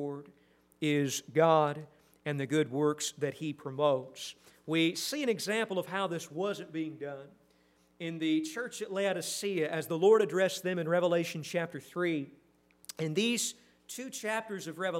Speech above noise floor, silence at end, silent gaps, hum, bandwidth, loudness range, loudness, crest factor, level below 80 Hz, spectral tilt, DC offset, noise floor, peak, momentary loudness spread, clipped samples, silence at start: 36 dB; 0 s; none; none; 16 kHz; 6 LU; -32 LUFS; 20 dB; -80 dBFS; -4.5 dB/octave; under 0.1%; -67 dBFS; -12 dBFS; 15 LU; under 0.1%; 0 s